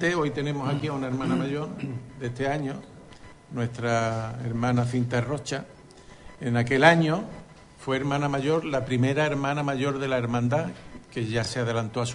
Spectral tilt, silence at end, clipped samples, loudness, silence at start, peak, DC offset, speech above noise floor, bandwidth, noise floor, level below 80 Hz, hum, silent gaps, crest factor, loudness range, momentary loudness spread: -6 dB/octave; 0 s; under 0.1%; -26 LUFS; 0 s; -4 dBFS; under 0.1%; 23 dB; 11 kHz; -49 dBFS; -54 dBFS; none; none; 22 dB; 6 LU; 12 LU